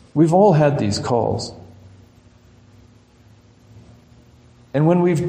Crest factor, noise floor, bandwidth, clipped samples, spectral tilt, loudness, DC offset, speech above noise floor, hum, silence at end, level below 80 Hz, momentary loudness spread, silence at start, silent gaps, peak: 18 dB; -50 dBFS; 9.8 kHz; under 0.1%; -7 dB/octave; -17 LUFS; under 0.1%; 34 dB; none; 0 s; -52 dBFS; 13 LU; 0.15 s; none; -2 dBFS